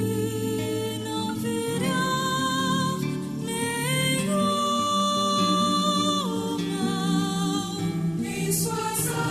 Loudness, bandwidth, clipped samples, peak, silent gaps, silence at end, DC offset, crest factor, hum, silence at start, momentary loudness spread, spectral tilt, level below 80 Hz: -25 LUFS; 13.5 kHz; under 0.1%; -10 dBFS; none; 0 s; under 0.1%; 14 dB; none; 0 s; 6 LU; -4 dB/octave; -56 dBFS